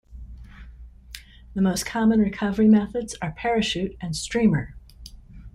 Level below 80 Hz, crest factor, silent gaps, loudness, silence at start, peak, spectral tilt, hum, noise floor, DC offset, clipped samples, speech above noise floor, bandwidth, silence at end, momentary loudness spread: -44 dBFS; 16 dB; none; -23 LUFS; 0.1 s; -8 dBFS; -5.5 dB/octave; none; -44 dBFS; under 0.1%; under 0.1%; 23 dB; 13 kHz; 0.05 s; 24 LU